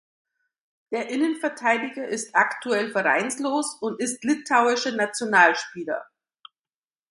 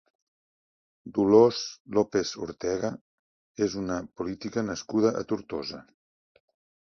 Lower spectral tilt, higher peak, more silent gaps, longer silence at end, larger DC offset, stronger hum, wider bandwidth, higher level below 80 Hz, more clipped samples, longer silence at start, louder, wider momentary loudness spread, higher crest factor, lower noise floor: second, -2.5 dB/octave vs -5.5 dB/octave; first, -2 dBFS vs -6 dBFS; second, none vs 1.80-1.85 s, 3.01-3.55 s; about the same, 1.05 s vs 1.05 s; neither; neither; first, 11.5 kHz vs 7.2 kHz; second, -76 dBFS vs -60 dBFS; neither; second, 0.9 s vs 1.05 s; first, -23 LUFS vs -27 LUFS; second, 12 LU vs 15 LU; about the same, 22 dB vs 22 dB; about the same, under -90 dBFS vs under -90 dBFS